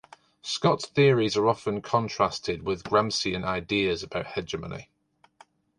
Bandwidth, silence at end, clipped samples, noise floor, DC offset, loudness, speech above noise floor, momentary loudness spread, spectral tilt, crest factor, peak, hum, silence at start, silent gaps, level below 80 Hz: 11 kHz; 0.95 s; under 0.1%; -59 dBFS; under 0.1%; -26 LUFS; 33 dB; 12 LU; -5 dB/octave; 20 dB; -6 dBFS; none; 0.45 s; none; -54 dBFS